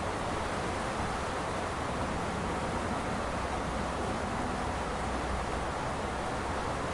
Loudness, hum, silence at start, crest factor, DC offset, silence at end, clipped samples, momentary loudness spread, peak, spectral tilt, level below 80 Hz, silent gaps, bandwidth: -34 LUFS; none; 0 s; 12 dB; under 0.1%; 0 s; under 0.1%; 1 LU; -20 dBFS; -5 dB/octave; -44 dBFS; none; 11.5 kHz